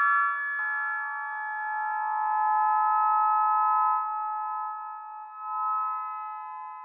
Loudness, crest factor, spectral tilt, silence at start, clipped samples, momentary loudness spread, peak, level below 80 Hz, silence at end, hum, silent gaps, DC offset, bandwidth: -27 LUFS; 14 dB; 7.5 dB/octave; 0 s; under 0.1%; 14 LU; -14 dBFS; under -90 dBFS; 0 s; none; none; under 0.1%; 3.6 kHz